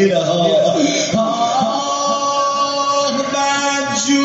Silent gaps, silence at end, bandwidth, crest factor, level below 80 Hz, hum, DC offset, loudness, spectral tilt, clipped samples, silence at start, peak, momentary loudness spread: none; 0 s; 8 kHz; 14 dB; -58 dBFS; none; under 0.1%; -16 LUFS; -3 dB/octave; under 0.1%; 0 s; -2 dBFS; 3 LU